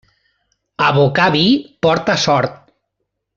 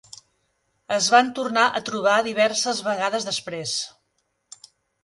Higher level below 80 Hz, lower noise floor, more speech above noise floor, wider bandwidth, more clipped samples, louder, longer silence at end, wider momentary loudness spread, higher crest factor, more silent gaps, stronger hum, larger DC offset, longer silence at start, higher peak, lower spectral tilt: first, -52 dBFS vs -68 dBFS; about the same, -74 dBFS vs -72 dBFS; first, 60 dB vs 51 dB; second, 7.6 kHz vs 11.5 kHz; neither; first, -14 LUFS vs -22 LUFS; second, 0.85 s vs 1.15 s; second, 5 LU vs 10 LU; second, 14 dB vs 20 dB; neither; neither; neither; about the same, 0.8 s vs 0.9 s; about the same, -2 dBFS vs -4 dBFS; first, -5 dB/octave vs -2 dB/octave